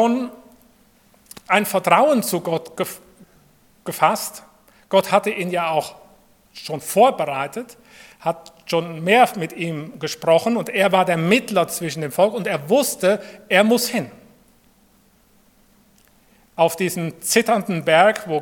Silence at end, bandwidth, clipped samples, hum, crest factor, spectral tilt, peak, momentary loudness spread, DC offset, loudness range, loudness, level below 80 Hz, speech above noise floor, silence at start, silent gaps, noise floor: 0 s; 18 kHz; under 0.1%; none; 20 dB; -4 dB/octave; 0 dBFS; 14 LU; under 0.1%; 5 LU; -19 LUFS; -66 dBFS; 37 dB; 0 s; none; -56 dBFS